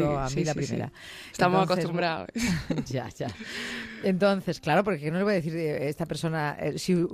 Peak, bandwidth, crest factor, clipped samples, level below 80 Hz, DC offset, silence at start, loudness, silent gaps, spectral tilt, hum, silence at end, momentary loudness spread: -8 dBFS; 15 kHz; 20 dB; under 0.1%; -50 dBFS; under 0.1%; 0 s; -28 LUFS; none; -6 dB/octave; none; 0 s; 10 LU